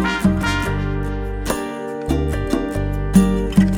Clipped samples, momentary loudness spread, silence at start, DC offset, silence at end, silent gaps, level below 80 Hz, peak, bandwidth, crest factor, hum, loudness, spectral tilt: under 0.1%; 9 LU; 0 s; under 0.1%; 0 s; none; -26 dBFS; 0 dBFS; 16.5 kHz; 18 dB; none; -20 LUFS; -6.5 dB/octave